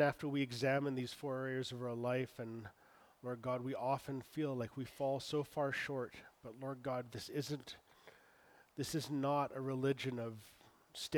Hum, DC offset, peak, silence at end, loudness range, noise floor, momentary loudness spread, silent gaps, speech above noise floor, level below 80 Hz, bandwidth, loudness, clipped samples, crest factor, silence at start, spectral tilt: none; under 0.1%; -20 dBFS; 0 s; 3 LU; -67 dBFS; 14 LU; none; 27 dB; -76 dBFS; over 20 kHz; -41 LUFS; under 0.1%; 20 dB; 0 s; -5.5 dB/octave